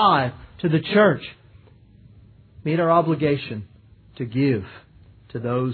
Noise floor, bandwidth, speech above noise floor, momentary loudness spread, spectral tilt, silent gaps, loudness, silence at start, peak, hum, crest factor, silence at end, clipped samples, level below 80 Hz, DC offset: -50 dBFS; 4.6 kHz; 30 dB; 17 LU; -10.5 dB/octave; none; -22 LUFS; 0 s; -4 dBFS; none; 18 dB; 0 s; under 0.1%; -54 dBFS; under 0.1%